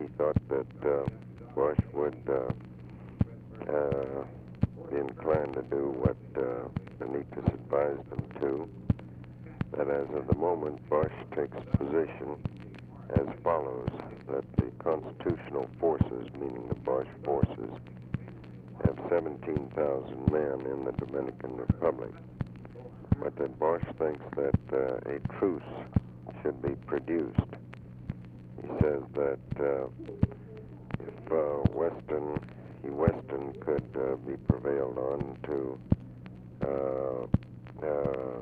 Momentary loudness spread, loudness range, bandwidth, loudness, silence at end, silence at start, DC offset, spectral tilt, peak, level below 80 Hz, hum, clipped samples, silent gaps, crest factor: 13 LU; 2 LU; 4.9 kHz; -33 LUFS; 0 s; 0 s; under 0.1%; -11 dB/octave; -10 dBFS; -48 dBFS; none; under 0.1%; none; 22 dB